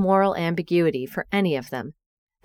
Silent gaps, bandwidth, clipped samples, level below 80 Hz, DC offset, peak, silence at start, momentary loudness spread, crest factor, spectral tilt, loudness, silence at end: none; 17 kHz; under 0.1%; -58 dBFS; under 0.1%; -6 dBFS; 0 s; 13 LU; 16 dB; -7.5 dB/octave; -24 LUFS; 0.55 s